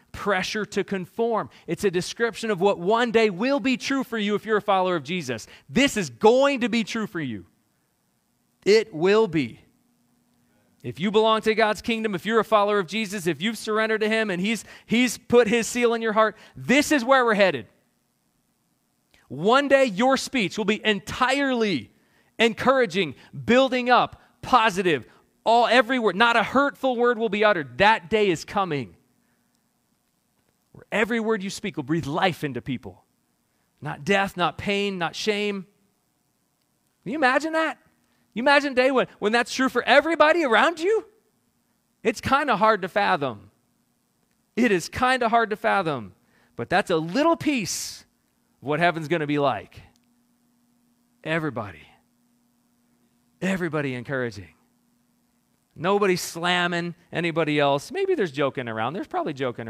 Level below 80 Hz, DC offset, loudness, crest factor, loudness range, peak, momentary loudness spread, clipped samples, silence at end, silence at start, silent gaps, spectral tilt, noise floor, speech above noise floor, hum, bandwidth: -60 dBFS; under 0.1%; -23 LUFS; 20 dB; 7 LU; -4 dBFS; 12 LU; under 0.1%; 0 s; 0.15 s; none; -4.5 dB/octave; -70 dBFS; 48 dB; none; 15.5 kHz